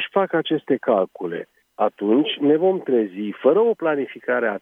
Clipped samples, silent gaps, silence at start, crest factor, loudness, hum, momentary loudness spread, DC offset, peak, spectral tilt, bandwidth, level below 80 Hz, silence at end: under 0.1%; none; 0 s; 16 dB; -21 LUFS; none; 9 LU; under 0.1%; -4 dBFS; -8 dB/octave; 3.8 kHz; -78 dBFS; 0.05 s